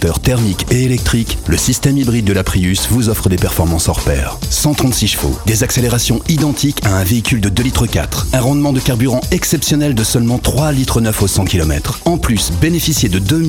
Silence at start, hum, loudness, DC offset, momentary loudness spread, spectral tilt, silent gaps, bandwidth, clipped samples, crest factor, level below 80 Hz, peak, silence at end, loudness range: 0 s; none; -14 LUFS; under 0.1%; 3 LU; -4.5 dB/octave; none; 17.5 kHz; under 0.1%; 14 dB; -24 dBFS; 0 dBFS; 0 s; 0 LU